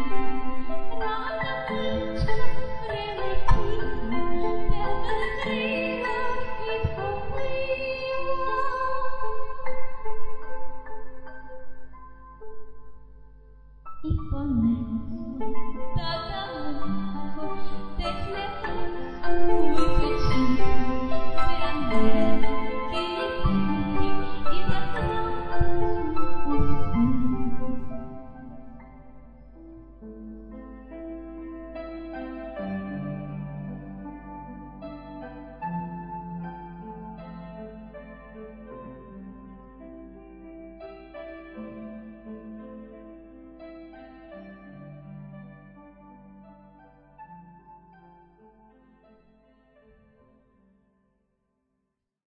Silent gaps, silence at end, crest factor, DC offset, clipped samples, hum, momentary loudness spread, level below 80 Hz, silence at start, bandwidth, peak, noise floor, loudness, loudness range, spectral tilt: none; 5.1 s; 16 dB; under 0.1%; under 0.1%; none; 21 LU; -36 dBFS; 0 s; 5.8 kHz; -6 dBFS; -80 dBFS; -30 LUFS; 17 LU; -7.5 dB/octave